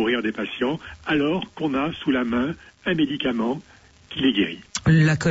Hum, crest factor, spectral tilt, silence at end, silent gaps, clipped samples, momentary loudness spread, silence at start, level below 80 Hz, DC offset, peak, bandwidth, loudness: none; 16 dB; -6 dB/octave; 0 s; none; under 0.1%; 9 LU; 0 s; -48 dBFS; under 0.1%; -6 dBFS; 8 kHz; -23 LUFS